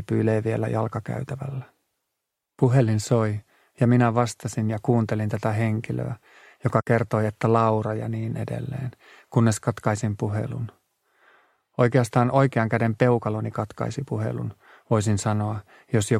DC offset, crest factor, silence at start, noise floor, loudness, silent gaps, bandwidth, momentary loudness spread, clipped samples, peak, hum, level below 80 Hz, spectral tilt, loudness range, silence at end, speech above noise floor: under 0.1%; 20 dB; 0 s; -82 dBFS; -24 LUFS; none; 13 kHz; 12 LU; under 0.1%; -4 dBFS; none; -58 dBFS; -7 dB/octave; 3 LU; 0 s; 59 dB